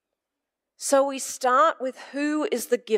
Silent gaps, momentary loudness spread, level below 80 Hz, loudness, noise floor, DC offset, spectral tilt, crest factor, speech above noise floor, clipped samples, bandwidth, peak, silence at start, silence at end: none; 12 LU; -78 dBFS; -24 LUFS; -85 dBFS; under 0.1%; -2 dB/octave; 16 dB; 62 dB; under 0.1%; 16 kHz; -8 dBFS; 0.8 s; 0 s